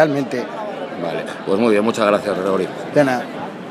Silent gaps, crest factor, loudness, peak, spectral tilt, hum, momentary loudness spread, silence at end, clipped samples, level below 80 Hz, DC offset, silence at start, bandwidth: none; 18 dB; -19 LUFS; 0 dBFS; -6 dB/octave; none; 11 LU; 0 s; under 0.1%; -66 dBFS; under 0.1%; 0 s; 15 kHz